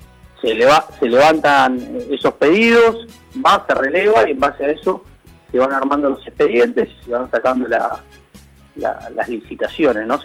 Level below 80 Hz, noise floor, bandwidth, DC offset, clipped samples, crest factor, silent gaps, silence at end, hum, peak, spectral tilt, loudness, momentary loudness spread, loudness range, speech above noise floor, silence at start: -48 dBFS; -45 dBFS; 15.5 kHz; under 0.1%; under 0.1%; 14 dB; none; 0 s; none; -2 dBFS; -4.5 dB/octave; -16 LUFS; 12 LU; 6 LU; 29 dB; 0.45 s